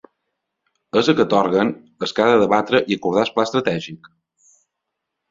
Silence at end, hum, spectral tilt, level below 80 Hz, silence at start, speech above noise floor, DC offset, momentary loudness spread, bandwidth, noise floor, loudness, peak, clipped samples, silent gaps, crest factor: 1.35 s; none; -5.5 dB/octave; -58 dBFS; 0.95 s; 62 dB; under 0.1%; 9 LU; 7.8 kHz; -80 dBFS; -18 LUFS; -2 dBFS; under 0.1%; none; 18 dB